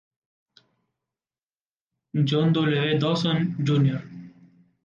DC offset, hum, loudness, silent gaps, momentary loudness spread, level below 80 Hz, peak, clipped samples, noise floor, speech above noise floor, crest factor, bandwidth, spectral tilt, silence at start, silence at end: under 0.1%; none; -23 LUFS; none; 12 LU; -66 dBFS; -10 dBFS; under 0.1%; under -90 dBFS; over 68 dB; 16 dB; 7.4 kHz; -7.5 dB/octave; 2.15 s; 0.55 s